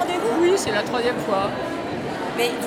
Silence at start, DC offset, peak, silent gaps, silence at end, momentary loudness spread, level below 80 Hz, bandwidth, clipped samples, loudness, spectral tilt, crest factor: 0 s; under 0.1%; -8 dBFS; none; 0 s; 8 LU; -54 dBFS; 16.5 kHz; under 0.1%; -22 LUFS; -4 dB/octave; 14 dB